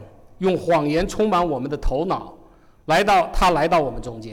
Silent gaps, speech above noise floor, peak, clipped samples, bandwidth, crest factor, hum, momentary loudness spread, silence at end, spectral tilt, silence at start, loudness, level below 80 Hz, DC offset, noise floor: none; 30 dB; -12 dBFS; under 0.1%; 18 kHz; 10 dB; none; 10 LU; 0 s; -5.5 dB/octave; 0 s; -20 LUFS; -32 dBFS; under 0.1%; -49 dBFS